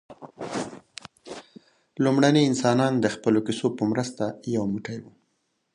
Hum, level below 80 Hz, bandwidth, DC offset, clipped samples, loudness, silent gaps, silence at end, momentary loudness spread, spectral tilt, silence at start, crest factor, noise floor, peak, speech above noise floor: none; -64 dBFS; 11 kHz; under 0.1%; under 0.1%; -24 LUFS; none; 0.7 s; 22 LU; -6 dB/octave; 0.1 s; 20 dB; -74 dBFS; -6 dBFS; 50 dB